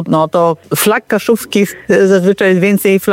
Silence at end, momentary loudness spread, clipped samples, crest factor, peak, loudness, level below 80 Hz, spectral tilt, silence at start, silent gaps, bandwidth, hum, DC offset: 0 s; 4 LU; under 0.1%; 10 dB; 0 dBFS; -11 LUFS; -52 dBFS; -5 dB/octave; 0 s; none; 17 kHz; none; under 0.1%